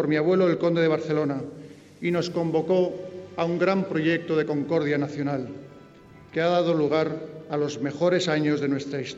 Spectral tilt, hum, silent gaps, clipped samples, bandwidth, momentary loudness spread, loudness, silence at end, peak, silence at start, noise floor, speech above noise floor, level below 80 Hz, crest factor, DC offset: -6.5 dB/octave; none; none; under 0.1%; 8 kHz; 11 LU; -25 LUFS; 0 s; -10 dBFS; 0 s; -49 dBFS; 25 dB; -66 dBFS; 14 dB; under 0.1%